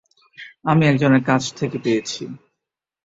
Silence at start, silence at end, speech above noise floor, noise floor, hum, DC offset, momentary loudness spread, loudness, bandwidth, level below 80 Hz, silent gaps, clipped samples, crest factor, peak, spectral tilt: 0.4 s; 0.7 s; 66 dB; -84 dBFS; none; under 0.1%; 19 LU; -19 LUFS; 8 kHz; -58 dBFS; none; under 0.1%; 18 dB; -2 dBFS; -6 dB/octave